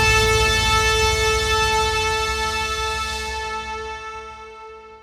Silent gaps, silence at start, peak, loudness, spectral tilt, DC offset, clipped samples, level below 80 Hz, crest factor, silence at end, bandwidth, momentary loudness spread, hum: none; 0 s; -4 dBFS; -19 LUFS; -2 dB/octave; under 0.1%; under 0.1%; -30 dBFS; 16 dB; 0.05 s; 17.5 kHz; 19 LU; none